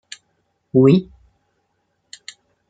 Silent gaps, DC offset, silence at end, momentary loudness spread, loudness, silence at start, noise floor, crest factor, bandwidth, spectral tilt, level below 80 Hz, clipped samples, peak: none; under 0.1%; 1.65 s; 26 LU; -16 LUFS; 0.75 s; -69 dBFS; 20 dB; 9.2 kHz; -8 dB/octave; -58 dBFS; under 0.1%; -2 dBFS